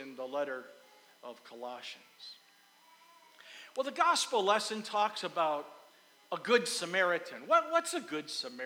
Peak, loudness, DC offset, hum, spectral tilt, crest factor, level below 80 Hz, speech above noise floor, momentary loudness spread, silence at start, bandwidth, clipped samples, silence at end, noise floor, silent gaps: -12 dBFS; -32 LUFS; under 0.1%; none; -2 dB/octave; 22 dB; under -90 dBFS; 30 dB; 21 LU; 0 s; over 20 kHz; under 0.1%; 0 s; -63 dBFS; none